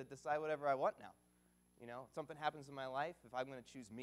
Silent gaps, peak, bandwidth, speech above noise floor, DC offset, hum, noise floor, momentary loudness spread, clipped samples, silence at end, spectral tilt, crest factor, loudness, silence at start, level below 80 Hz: none; -24 dBFS; 15 kHz; 30 dB; under 0.1%; 60 Hz at -75 dBFS; -74 dBFS; 15 LU; under 0.1%; 0 s; -5 dB/octave; 20 dB; -44 LUFS; 0 s; -80 dBFS